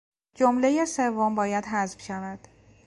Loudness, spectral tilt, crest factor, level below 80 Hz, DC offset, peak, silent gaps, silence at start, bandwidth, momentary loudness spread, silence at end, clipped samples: -26 LUFS; -5 dB/octave; 18 dB; -62 dBFS; under 0.1%; -8 dBFS; none; 0.4 s; 11.5 kHz; 13 LU; 0.5 s; under 0.1%